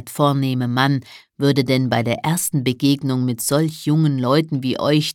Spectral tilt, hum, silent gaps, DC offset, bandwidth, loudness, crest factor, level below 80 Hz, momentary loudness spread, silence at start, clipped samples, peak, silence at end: -5.5 dB/octave; none; none; under 0.1%; 17.5 kHz; -19 LUFS; 18 dB; -60 dBFS; 3 LU; 0 s; under 0.1%; -2 dBFS; 0 s